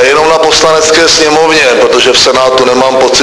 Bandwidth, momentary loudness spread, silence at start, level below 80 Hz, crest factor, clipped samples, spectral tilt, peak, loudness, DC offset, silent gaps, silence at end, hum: 11 kHz; 2 LU; 0 s; -36 dBFS; 6 dB; 3%; -1.5 dB/octave; 0 dBFS; -5 LUFS; under 0.1%; none; 0 s; none